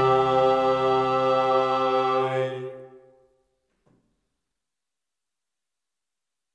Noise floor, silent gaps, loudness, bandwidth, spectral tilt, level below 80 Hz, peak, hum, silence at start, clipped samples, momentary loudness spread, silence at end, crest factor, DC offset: -88 dBFS; none; -22 LUFS; 9.2 kHz; -6.5 dB/octave; -62 dBFS; -10 dBFS; none; 0 s; under 0.1%; 9 LU; 3.65 s; 16 dB; under 0.1%